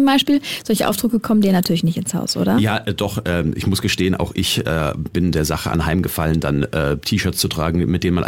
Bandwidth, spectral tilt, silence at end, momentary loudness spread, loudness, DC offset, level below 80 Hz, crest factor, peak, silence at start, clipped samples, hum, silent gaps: 17 kHz; -5 dB/octave; 0 s; 5 LU; -19 LUFS; under 0.1%; -36 dBFS; 14 dB; -4 dBFS; 0 s; under 0.1%; none; none